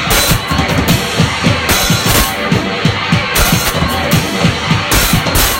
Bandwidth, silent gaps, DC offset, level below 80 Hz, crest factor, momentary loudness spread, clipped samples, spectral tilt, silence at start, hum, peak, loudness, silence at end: 17 kHz; none; under 0.1%; -22 dBFS; 12 dB; 4 LU; under 0.1%; -3.5 dB/octave; 0 s; none; 0 dBFS; -12 LUFS; 0 s